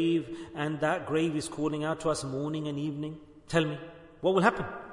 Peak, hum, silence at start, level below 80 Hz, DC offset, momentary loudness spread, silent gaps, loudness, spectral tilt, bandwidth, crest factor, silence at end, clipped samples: -10 dBFS; none; 0 s; -60 dBFS; under 0.1%; 13 LU; none; -30 LUFS; -5.5 dB/octave; 11 kHz; 22 dB; 0 s; under 0.1%